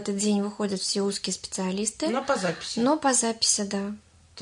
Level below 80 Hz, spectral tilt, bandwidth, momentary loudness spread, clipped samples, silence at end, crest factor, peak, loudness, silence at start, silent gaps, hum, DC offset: -64 dBFS; -3 dB/octave; 11 kHz; 8 LU; under 0.1%; 0 s; 18 dB; -8 dBFS; -26 LUFS; 0 s; none; none; under 0.1%